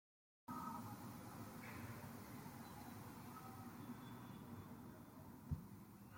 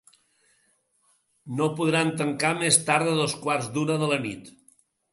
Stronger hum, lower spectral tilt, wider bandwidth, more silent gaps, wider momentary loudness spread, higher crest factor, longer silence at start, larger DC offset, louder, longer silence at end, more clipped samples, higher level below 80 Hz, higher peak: neither; first, -6 dB/octave vs -3.5 dB/octave; first, 16.5 kHz vs 12 kHz; neither; about the same, 7 LU vs 8 LU; about the same, 20 dB vs 24 dB; second, 0.5 s vs 1.45 s; neither; second, -55 LUFS vs -24 LUFS; second, 0 s vs 0.65 s; neither; about the same, -70 dBFS vs -68 dBFS; second, -34 dBFS vs -2 dBFS